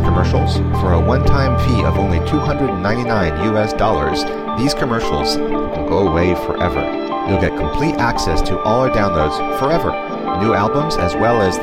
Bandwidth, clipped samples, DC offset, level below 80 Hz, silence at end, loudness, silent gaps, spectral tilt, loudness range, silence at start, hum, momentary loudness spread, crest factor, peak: 15.5 kHz; under 0.1%; 0.7%; -26 dBFS; 0 s; -17 LUFS; none; -6.5 dB/octave; 2 LU; 0 s; none; 4 LU; 14 dB; -2 dBFS